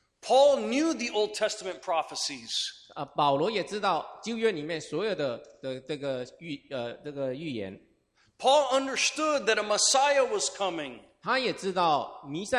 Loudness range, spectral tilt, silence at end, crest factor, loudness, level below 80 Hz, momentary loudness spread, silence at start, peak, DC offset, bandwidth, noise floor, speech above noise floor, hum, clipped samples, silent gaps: 9 LU; -2.5 dB/octave; 0 s; 18 dB; -28 LUFS; -70 dBFS; 14 LU; 0.25 s; -10 dBFS; under 0.1%; 14.5 kHz; -68 dBFS; 40 dB; none; under 0.1%; none